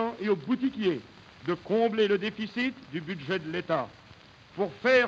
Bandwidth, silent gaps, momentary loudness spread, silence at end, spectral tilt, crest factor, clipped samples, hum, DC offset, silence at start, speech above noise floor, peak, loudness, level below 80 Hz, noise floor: 7.8 kHz; none; 12 LU; 0 s; -6.5 dB/octave; 18 dB; under 0.1%; none; under 0.1%; 0 s; 25 dB; -12 dBFS; -29 LUFS; -66 dBFS; -53 dBFS